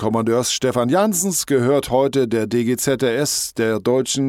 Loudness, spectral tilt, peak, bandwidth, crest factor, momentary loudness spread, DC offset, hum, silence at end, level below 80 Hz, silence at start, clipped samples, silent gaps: -18 LUFS; -4 dB/octave; -4 dBFS; 17 kHz; 14 dB; 3 LU; under 0.1%; none; 0 s; -52 dBFS; 0 s; under 0.1%; none